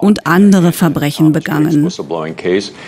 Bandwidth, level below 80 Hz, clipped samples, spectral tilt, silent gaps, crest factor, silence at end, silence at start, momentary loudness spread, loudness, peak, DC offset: 16 kHz; -48 dBFS; under 0.1%; -6.5 dB/octave; none; 12 dB; 0 s; 0 s; 9 LU; -12 LUFS; 0 dBFS; under 0.1%